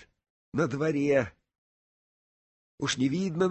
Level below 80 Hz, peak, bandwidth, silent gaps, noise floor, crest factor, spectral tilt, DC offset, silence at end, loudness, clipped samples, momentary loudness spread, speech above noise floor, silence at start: -62 dBFS; -12 dBFS; 8.6 kHz; 1.58-2.78 s; under -90 dBFS; 18 dB; -5.5 dB/octave; under 0.1%; 0 s; -29 LUFS; under 0.1%; 9 LU; over 63 dB; 0.55 s